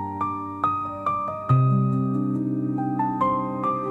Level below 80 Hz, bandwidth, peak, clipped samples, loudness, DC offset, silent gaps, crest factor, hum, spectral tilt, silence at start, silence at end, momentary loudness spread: -58 dBFS; 4 kHz; -8 dBFS; under 0.1%; -24 LUFS; under 0.1%; none; 16 dB; none; -10.5 dB/octave; 0 s; 0 s; 6 LU